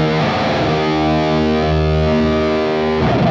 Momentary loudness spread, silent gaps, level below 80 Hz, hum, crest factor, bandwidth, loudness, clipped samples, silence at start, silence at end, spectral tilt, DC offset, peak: 1 LU; none; -28 dBFS; none; 10 dB; 7.6 kHz; -16 LUFS; under 0.1%; 0 s; 0 s; -7 dB/octave; under 0.1%; -4 dBFS